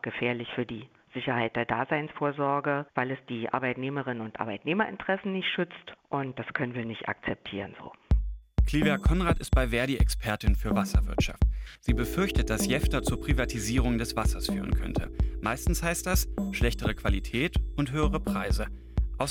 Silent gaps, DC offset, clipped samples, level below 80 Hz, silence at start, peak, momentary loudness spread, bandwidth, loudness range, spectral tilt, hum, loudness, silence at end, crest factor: none; under 0.1%; under 0.1%; -32 dBFS; 0.05 s; -10 dBFS; 8 LU; 17 kHz; 4 LU; -5.5 dB/octave; none; -29 LUFS; 0 s; 18 dB